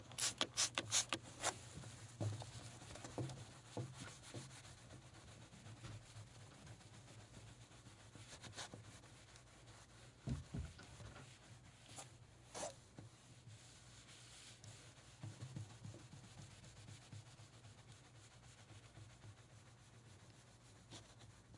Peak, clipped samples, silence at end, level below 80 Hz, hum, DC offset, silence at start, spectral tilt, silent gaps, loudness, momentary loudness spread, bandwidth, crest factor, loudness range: -20 dBFS; under 0.1%; 0 s; -70 dBFS; none; under 0.1%; 0 s; -2.5 dB/octave; none; -49 LUFS; 18 LU; 11.5 kHz; 32 dB; 15 LU